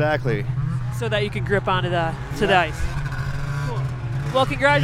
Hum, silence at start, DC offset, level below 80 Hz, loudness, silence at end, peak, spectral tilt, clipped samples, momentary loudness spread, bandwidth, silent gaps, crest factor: none; 0 s; under 0.1%; -34 dBFS; -23 LUFS; 0 s; -4 dBFS; -6 dB/octave; under 0.1%; 9 LU; 14 kHz; none; 18 dB